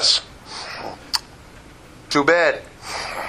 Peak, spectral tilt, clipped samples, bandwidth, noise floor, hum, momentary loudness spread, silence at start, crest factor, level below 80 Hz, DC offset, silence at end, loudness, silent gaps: 0 dBFS; -2 dB/octave; under 0.1%; 15.5 kHz; -43 dBFS; none; 16 LU; 0 s; 22 dB; -50 dBFS; under 0.1%; 0 s; -21 LUFS; none